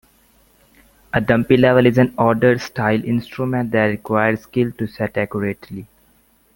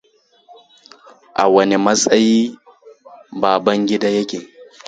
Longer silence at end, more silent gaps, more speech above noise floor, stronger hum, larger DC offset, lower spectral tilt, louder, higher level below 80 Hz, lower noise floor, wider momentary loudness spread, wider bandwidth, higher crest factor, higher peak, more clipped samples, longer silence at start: first, 0.7 s vs 0.25 s; neither; about the same, 39 dB vs 36 dB; neither; neither; first, -7.5 dB/octave vs -4 dB/octave; about the same, -18 LUFS vs -16 LUFS; first, -50 dBFS vs -60 dBFS; first, -57 dBFS vs -50 dBFS; about the same, 11 LU vs 13 LU; first, 17 kHz vs 9.4 kHz; about the same, 18 dB vs 18 dB; about the same, 0 dBFS vs 0 dBFS; neither; second, 1.15 s vs 1.35 s